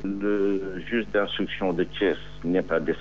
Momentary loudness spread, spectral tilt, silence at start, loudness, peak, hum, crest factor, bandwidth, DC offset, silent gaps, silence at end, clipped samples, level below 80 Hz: 4 LU; -4 dB/octave; 0 s; -26 LUFS; -10 dBFS; 50 Hz at -45 dBFS; 16 dB; 7.2 kHz; 1%; none; 0 s; under 0.1%; -48 dBFS